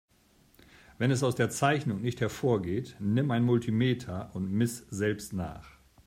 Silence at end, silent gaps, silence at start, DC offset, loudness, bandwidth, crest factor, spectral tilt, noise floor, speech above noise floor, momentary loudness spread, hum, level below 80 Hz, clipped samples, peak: 0.4 s; none; 1 s; under 0.1%; -30 LUFS; 16 kHz; 18 dB; -6 dB/octave; -64 dBFS; 35 dB; 9 LU; none; -60 dBFS; under 0.1%; -12 dBFS